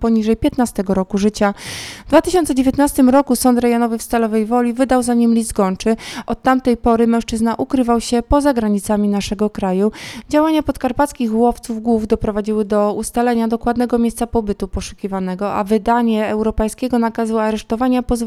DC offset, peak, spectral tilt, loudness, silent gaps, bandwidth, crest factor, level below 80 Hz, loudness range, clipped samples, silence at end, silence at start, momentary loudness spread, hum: under 0.1%; 0 dBFS; -5.5 dB/octave; -17 LUFS; none; 14.5 kHz; 16 dB; -34 dBFS; 3 LU; under 0.1%; 0 s; 0 s; 6 LU; none